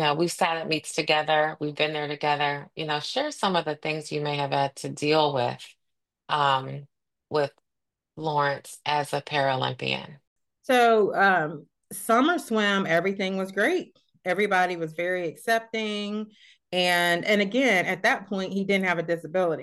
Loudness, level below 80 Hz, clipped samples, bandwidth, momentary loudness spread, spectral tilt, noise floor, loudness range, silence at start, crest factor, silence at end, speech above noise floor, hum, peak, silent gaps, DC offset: -25 LUFS; -74 dBFS; under 0.1%; 12.5 kHz; 10 LU; -4.5 dB/octave; -85 dBFS; 5 LU; 0 s; 18 dB; 0 s; 60 dB; none; -8 dBFS; 10.27-10.36 s; under 0.1%